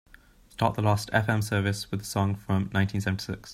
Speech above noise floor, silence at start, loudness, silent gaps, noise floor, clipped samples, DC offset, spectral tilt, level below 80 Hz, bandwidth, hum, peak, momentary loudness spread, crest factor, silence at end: 28 dB; 0.6 s; -27 LUFS; none; -55 dBFS; under 0.1%; under 0.1%; -6 dB/octave; -54 dBFS; 15.5 kHz; none; -6 dBFS; 6 LU; 22 dB; 0 s